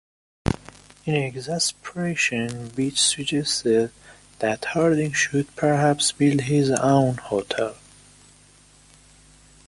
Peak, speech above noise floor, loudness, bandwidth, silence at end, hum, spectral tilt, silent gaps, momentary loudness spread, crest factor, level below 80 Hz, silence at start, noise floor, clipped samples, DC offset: -2 dBFS; 31 dB; -22 LUFS; 11.5 kHz; 1.95 s; 50 Hz at -50 dBFS; -4 dB/octave; none; 9 LU; 22 dB; -48 dBFS; 0.45 s; -53 dBFS; under 0.1%; under 0.1%